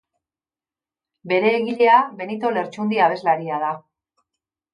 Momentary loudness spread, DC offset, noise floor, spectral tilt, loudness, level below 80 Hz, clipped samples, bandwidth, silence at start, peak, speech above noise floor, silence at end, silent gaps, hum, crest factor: 10 LU; under 0.1%; under -90 dBFS; -6.5 dB/octave; -20 LUFS; -76 dBFS; under 0.1%; 10 kHz; 1.25 s; -2 dBFS; over 71 dB; 0.95 s; none; none; 20 dB